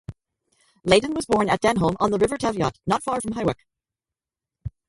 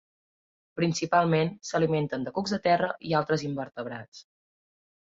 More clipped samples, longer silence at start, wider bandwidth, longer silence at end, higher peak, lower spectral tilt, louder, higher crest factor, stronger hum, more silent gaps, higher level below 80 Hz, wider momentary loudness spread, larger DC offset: neither; second, 0.1 s vs 0.75 s; first, 11.5 kHz vs 7.8 kHz; second, 0.2 s vs 0.95 s; first, -4 dBFS vs -10 dBFS; about the same, -5 dB/octave vs -5.5 dB/octave; first, -22 LUFS vs -27 LUFS; about the same, 20 dB vs 20 dB; neither; second, none vs 4.08-4.12 s; first, -48 dBFS vs -66 dBFS; first, 16 LU vs 13 LU; neither